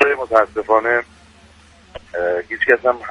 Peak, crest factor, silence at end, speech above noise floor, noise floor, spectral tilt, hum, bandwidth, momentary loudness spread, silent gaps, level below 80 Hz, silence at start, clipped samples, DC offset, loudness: 0 dBFS; 18 dB; 0 s; 30 dB; -47 dBFS; -5 dB/octave; none; 11 kHz; 8 LU; none; -50 dBFS; 0 s; under 0.1%; under 0.1%; -17 LUFS